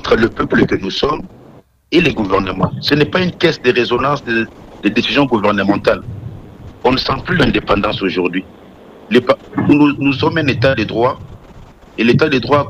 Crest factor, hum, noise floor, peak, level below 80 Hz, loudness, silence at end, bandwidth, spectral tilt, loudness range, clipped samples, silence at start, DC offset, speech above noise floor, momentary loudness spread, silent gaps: 14 dB; none; -43 dBFS; -2 dBFS; -38 dBFS; -15 LUFS; 0 s; 13 kHz; -6.5 dB/octave; 2 LU; under 0.1%; 0.05 s; under 0.1%; 29 dB; 7 LU; none